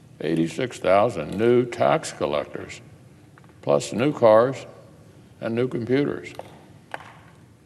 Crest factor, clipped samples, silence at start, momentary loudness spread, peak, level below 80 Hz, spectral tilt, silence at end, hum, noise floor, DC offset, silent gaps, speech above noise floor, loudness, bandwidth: 20 dB; under 0.1%; 0.2 s; 21 LU; -4 dBFS; -60 dBFS; -6 dB/octave; 0.55 s; none; -50 dBFS; under 0.1%; none; 28 dB; -22 LUFS; 12.5 kHz